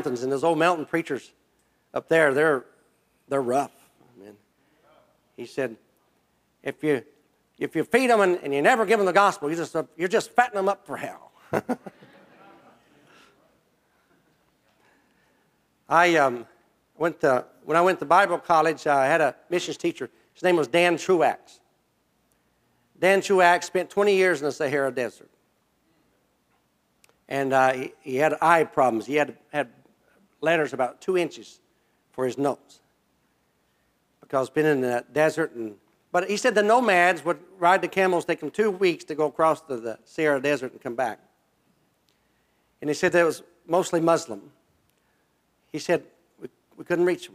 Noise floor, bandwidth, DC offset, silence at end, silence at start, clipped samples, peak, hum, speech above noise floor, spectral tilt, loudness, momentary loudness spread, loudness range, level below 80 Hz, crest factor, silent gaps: -69 dBFS; 16 kHz; under 0.1%; 0.1 s; 0 s; under 0.1%; -4 dBFS; none; 46 dB; -4.5 dB/octave; -23 LUFS; 15 LU; 10 LU; -74 dBFS; 22 dB; none